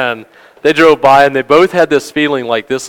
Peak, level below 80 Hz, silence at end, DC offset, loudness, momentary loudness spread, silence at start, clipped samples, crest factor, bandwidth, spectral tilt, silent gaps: 0 dBFS; -50 dBFS; 0 s; under 0.1%; -10 LUFS; 9 LU; 0 s; 1%; 10 dB; 18 kHz; -4.5 dB/octave; none